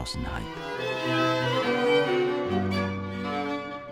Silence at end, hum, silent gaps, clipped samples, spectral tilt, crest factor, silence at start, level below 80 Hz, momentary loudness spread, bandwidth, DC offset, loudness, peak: 0 s; none; none; under 0.1%; -5.5 dB/octave; 16 dB; 0 s; -48 dBFS; 10 LU; 16.5 kHz; under 0.1%; -27 LUFS; -12 dBFS